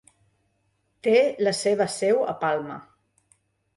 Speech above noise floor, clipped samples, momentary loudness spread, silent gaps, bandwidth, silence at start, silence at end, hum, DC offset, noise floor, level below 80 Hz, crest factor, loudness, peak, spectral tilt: 48 dB; under 0.1%; 9 LU; none; 11.5 kHz; 1.05 s; 0.95 s; none; under 0.1%; -71 dBFS; -72 dBFS; 18 dB; -23 LUFS; -8 dBFS; -4 dB/octave